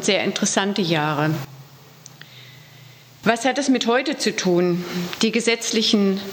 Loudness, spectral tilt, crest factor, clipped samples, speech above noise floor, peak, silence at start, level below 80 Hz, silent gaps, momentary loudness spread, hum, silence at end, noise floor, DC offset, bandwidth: -20 LUFS; -4 dB/octave; 20 dB; under 0.1%; 25 dB; -2 dBFS; 0 s; -68 dBFS; none; 9 LU; none; 0 s; -46 dBFS; under 0.1%; 19.5 kHz